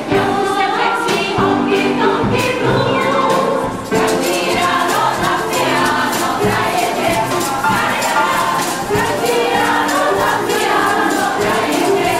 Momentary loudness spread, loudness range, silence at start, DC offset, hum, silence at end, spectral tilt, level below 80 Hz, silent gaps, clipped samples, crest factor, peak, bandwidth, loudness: 2 LU; 1 LU; 0 s; 0.3%; none; 0 s; -4 dB/octave; -42 dBFS; none; under 0.1%; 12 dB; -2 dBFS; 16 kHz; -15 LUFS